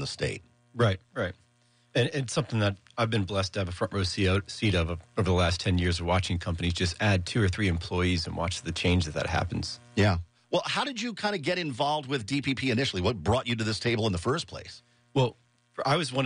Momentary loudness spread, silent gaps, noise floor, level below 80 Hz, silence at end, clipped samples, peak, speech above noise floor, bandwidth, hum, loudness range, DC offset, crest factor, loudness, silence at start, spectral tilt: 7 LU; none; -65 dBFS; -46 dBFS; 0 s; under 0.1%; -14 dBFS; 38 dB; 10.5 kHz; none; 2 LU; under 0.1%; 16 dB; -28 LUFS; 0 s; -5.5 dB/octave